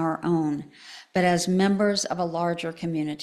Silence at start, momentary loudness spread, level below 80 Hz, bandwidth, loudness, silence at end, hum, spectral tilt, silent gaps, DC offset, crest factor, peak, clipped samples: 0 s; 9 LU; -62 dBFS; 14 kHz; -25 LUFS; 0 s; none; -5 dB/octave; none; under 0.1%; 16 dB; -8 dBFS; under 0.1%